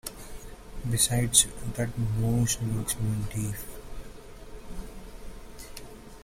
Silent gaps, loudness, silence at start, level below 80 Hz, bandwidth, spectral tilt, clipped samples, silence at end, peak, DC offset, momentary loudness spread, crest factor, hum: none; -27 LUFS; 0.05 s; -42 dBFS; 16.5 kHz; -3.5 dB/octave; under 0.1%; 0 s; -4 dBFS; under 0.1%; 26 LU; 26 dB; none